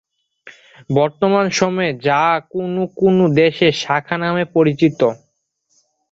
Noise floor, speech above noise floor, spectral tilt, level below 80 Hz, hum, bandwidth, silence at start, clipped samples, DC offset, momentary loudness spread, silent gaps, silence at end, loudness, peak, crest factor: -67 dBFS; 51 dB; -5.5 dB/octave; -56 dBFS; none; 8 kHz; 0.45 s; under 0.1%; under 0.1%; 7 LU; none; 0.95 s; -16 LUFS; -2 dBFS; 16 dB